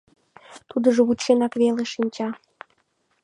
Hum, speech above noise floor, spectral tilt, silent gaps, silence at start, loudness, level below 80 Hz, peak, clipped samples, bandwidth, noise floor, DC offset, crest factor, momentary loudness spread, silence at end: none; 48 dB; -4.5 dB/octave; none; 0.5 s; -22 LUFS; -66 dBFS; -4 dBFS; under 0.1%; 10.5 kHz; -69 dBFS; under 0.1%; 18 dB; 11 LU; 0.9 s